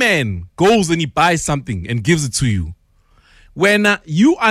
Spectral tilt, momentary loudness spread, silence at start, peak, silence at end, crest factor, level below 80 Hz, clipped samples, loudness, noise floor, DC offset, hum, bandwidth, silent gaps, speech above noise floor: -4.5 dB/octave; 9 LU; 0 s; -2 dBFS; 0 s; 14 dB; -40 dBFS; under 0.1%; -16 LUFS; -54 dBFS; under 0.1%; none; 15 kHz; none; 38 dB